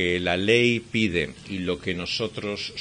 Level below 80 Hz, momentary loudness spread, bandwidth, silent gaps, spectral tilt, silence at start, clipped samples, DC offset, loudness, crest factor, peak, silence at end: -54 dBFS; 11 LU; 10.5 kHz; none; -5 dB/octave; 0 s; under 0.1%; under 0.1%; -24 LUFS; 20 dB; -4 dBFS; 0 s